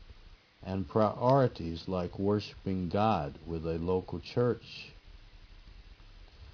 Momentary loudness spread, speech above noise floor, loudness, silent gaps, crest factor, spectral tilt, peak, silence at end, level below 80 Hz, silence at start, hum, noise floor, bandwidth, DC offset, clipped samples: 12 LU; 25 dB; -32 LUFS; none; 22 dB; -8.5 dB/octave; -12 dBFS; 0.05 s; -54 dBFS; 0 s; none; -56 dBFS; 5.4 kHz; under 0.1%; under 0.1%